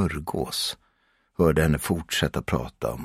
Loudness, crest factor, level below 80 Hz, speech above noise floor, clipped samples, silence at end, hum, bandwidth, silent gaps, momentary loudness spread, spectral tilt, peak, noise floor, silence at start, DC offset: -25 LUFS; 20 dB; -40 dBFS; 42 dB; under 0.1%; 0 s; none; 16 kHz; none; 9 LU; -5 dB/octave; -6 dBFS; -67 dBFS; 0 s; under 0.1%